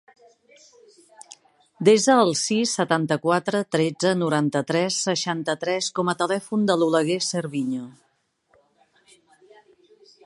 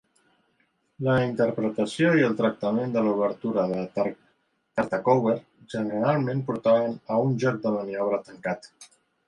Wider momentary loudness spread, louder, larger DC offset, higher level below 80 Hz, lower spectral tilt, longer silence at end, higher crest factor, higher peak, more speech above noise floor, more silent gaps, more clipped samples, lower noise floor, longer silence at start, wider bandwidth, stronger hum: about the same, 8 LU vs 9 LU; first, -22 LUFS vs -25 LUFS; neither; second, -72 dBFS vs -64 dBFS; second, -4 dB/octave vs -7.5 dB/octave; first, 2.35 s vs 0.4 s; about the same, 20 dB vs 18 dB; first, -4 dBFS vs -8 dBFS; about the same, 45 dB vs 45 dB; neither; neither; about the same, -67 dBFS vs -70 dBFS; first, 1.3 s vs 1 s; about the same, 11.5 kHz vs 11 kHz; neither